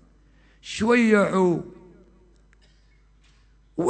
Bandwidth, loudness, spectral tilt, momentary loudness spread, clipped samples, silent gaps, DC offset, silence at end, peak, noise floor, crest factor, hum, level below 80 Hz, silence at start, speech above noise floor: 9 kHz; -21 LUFS; -6 dB/octave; 23 LU; under 0.1%; none; under 0.1%; 0 s; -6 dBFS; -57 dBFS; 20 dB; none; -56 dBFS; 0.65 s; 37 dB